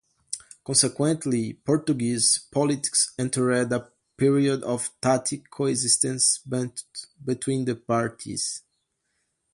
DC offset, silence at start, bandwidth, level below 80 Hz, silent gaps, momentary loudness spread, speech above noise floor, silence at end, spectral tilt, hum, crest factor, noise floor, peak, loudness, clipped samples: under 0.1%; 0.3 s; 11.5 kHz; -64 dBFS; none; 12 LU; 51 dB; 0.95 s; -3.5 dB/octave; none; 20 dB; -76 dBFS; -6 dBFS; -24 LUFS; under 0.1%